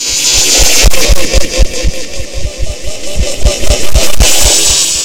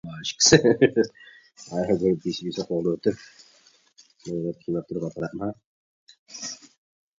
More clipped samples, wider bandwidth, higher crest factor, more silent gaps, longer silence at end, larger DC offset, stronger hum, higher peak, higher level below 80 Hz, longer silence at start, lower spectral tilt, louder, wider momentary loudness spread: first, 6% vs under 0.1%; first, over 20 kHz vs 7.8 kHz; second, 10 dB vs 26 dB; second, none vs 5.64-6.07 s, 6.19-6.26 s; second, 0 s vs 0.6 s; first, 20% vs under 0.1%; neither; about the same, 0 dBFS vs 0 dBFS; first, -14 dBFS vs -58 dBFS; about the same, 0 s vs 0.05 s; second, -1.5 dB/octave vs -4 dB/octave; first, -8 LUFS vs -24 LUFS; second, 15 LU vs 19 LU